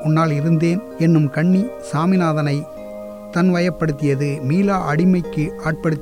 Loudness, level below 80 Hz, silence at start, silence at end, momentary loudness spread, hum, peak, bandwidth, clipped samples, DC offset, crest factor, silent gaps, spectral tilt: -18 LUFS; -46 dBFS; 0 s; 0 s; 8 LU; none; -4 dBFS; 11 kHz; under 0.1%; 0.2%; 12 dB; none; -8 dB/octave